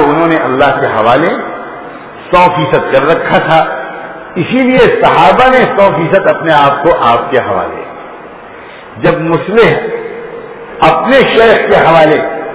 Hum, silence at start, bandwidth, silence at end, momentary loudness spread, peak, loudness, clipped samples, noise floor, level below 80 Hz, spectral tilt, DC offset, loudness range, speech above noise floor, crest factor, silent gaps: none; 0 s; 4 kHz; 0 s; 20 LU; 0 dBFS; -8 LUFS; 2%; -29 dBFS; -38 dBFS; -9.5 dB/octave; under 0.1%; 5 LU; 22 dB; 8 dB; none